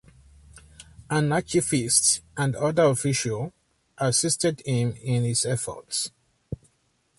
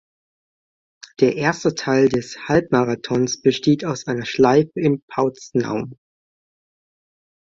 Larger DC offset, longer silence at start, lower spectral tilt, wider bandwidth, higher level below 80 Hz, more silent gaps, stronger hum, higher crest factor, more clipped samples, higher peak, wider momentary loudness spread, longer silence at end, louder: neither; second, 0.55 s vs 1.2 s; second, -4 dB/octave vs -5.5 dB/octave; first, 12 kHz vs 7.8 kHz; about the same, -54 dBFS vs -56 dBFS; second, none vs 5.02-5.08 s; neither; about the same, 20 dB vs 18 dB; neither; second, -6 dBFS vs -2 dBFS; first, 13 LU vs 8 LU; second, 0.65 s vs 1.65 s; second, -24 LUFS vs -19 LUFS